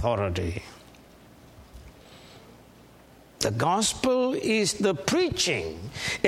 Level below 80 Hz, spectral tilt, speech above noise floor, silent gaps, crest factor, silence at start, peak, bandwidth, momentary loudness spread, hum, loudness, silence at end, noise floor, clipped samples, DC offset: -50 dBFS; -4 dB/octave; 27 dB; none; 24 dB; 0 s; -4 dBFS; 16.5 kHz; 10 LU; none; -26 LUFS; 0 s; -53 dBFS; under 0.1%; under 0.1%